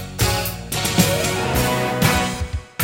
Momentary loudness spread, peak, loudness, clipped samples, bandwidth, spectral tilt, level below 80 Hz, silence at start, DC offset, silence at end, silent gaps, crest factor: 7 LU; 0 dBFS; -19 LUFS; under 0.1%; 16.5 kHz; -4 dB/octave; -32 dBFS; 0 s; under 0.1%; 0 s; none; 20 dB